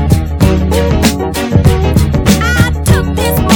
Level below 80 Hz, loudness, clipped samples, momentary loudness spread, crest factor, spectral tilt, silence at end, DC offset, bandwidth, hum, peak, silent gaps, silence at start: -16 dBFS; -11 LUFS; 0.5%; 3 LU; 10 dB; -5.5 dB/octave; 0 s; under 0.1%; 19 kHz; none; 0 dBFS; none; 0 s